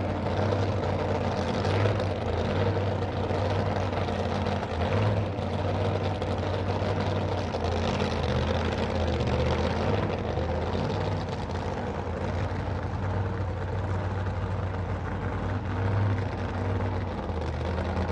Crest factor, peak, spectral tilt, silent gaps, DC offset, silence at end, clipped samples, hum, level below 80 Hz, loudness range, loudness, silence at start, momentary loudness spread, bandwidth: 18 dB; -10 dBFS; -7 dB/octave; none; under 0.1%; 0 s; under 0.1%; none; -42 dBFS; 3 LU; -29 LUFS; 0 s; 5 LU; 8.6 kHz